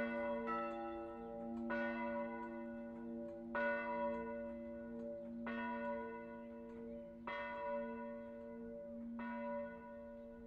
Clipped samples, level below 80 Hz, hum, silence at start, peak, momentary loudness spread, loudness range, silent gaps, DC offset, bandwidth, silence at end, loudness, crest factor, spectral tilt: under 0.1%; -70 dBFS; none; 0 s; -30 dBFS; 10 LU; 4 LU; none; under 0.1%; 5.6 kHz; 0 s; -46 LUFS; 16 dB; -7.5 dB/octave